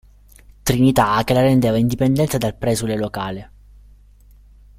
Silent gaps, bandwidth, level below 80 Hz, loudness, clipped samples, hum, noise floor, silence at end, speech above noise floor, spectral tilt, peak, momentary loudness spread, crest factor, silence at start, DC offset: none; 16 kHz; -40 dBFS; -18 LUFS; under 0.1%; 50 Hz at -40 dBFS; -47 dBFS; 1.35 s; 30 dB; -6 dB/octave; -2 dBFS; 11 LU; 18 dB; 0.65 s; under 0.1%